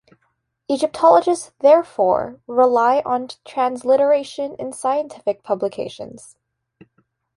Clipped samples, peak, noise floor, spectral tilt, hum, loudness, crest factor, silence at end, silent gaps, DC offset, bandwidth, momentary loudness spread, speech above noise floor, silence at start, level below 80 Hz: under 0.1%; -2 dBFS; -69 dBFS; -4.5 dB/octave; none; -18 LUFS; 18 dB; 1.2 s; none; under 0.1%; 11.5 kHz; 13 LU; 51 dB; 0.7 s; -62 dBFS